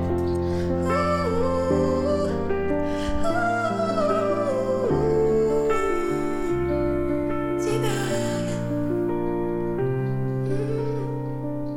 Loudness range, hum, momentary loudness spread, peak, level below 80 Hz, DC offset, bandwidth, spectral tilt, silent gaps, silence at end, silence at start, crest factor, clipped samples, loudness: 3 LU; none; 5 LU; -10 dBFS; -40 dBFS; under 0.1%; 16.5 kHz; -7 dB/octave; none; 0 s; 0 s; 12 dB; under 0.1%; -24 LUFS